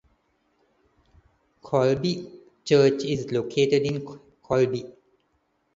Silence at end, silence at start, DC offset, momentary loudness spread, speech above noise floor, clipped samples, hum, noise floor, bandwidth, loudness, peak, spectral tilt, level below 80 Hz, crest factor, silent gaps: 0.85 s; 1.65 s; under 0.1%; 18 LU; 48 dB; under 0.1%; none; -71 dBFS; 7.8 kHz; -24 LUFS; -8 dBFS; -6 dB/octave; -60 dBFS; 20 dB; none